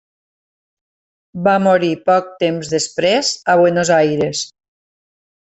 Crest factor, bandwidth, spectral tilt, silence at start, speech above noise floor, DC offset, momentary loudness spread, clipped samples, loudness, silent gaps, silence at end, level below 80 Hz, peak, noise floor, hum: 16 dB; 8.4 kHz; -4 dB/octave; 1.35 s; over 75 dB; under 0.1%; 7 LU; under 0.1%; -15 LUFS; none; 1 s; -58 dBFS; -2 dBFS; under -90 dBFS; none